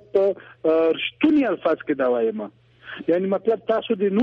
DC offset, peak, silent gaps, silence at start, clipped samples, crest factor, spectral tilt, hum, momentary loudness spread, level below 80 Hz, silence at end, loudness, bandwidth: under 0.1%; -6 dBFS; none; 0.15 s; under 0.1%; 16 dB; -8 dB/octave; none; 8 LU; -64 dBFS; 0 s; -22 LUFS; 5.4 kHz